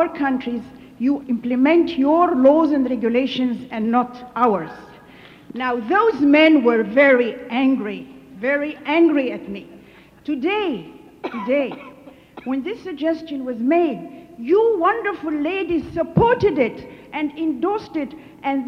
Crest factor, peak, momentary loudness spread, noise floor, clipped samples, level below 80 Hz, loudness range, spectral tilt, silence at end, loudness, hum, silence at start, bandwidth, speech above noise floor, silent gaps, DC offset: 16 dB; -2 dBFS; 17 LU; -46 dBFS; under 0.1%; -52 dBFS; 8 LU; -7.5 dB/octave; 0 s; -19 LUFS; none; 0 s; 6.4 kHz; 28 dB; none; under 0.1%